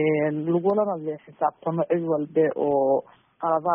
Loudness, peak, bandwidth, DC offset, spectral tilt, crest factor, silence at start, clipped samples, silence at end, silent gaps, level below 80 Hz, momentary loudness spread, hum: -24 LUFS; -10 dBFS; 3.6 kHz; under 0.1%; -4 dB/octave; 14 dB; 0 s; under 0.1%; 0 s; none; -70 dBFS; 5 LU; none